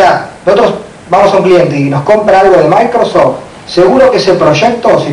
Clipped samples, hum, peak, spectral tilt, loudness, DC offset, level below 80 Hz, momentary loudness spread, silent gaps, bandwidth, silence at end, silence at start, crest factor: 4%; none; 0 dBFS; -6 dB/octave; -7 LUFS; under 0.1%; -40 dBFS; 7 LU; none; 11 kHz; 0 s; 0 s; 8 dB